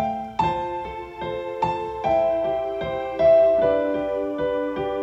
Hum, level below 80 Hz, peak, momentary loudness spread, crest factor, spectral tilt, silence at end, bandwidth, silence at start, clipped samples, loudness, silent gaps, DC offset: none; -48 dBFS; -8 dBFS; 13 LU; 14 dB; -7 dB/octave; 0 s; 7.8 kHz; 0 s; under 0.1%; -23 LUFS; none; under 0.1%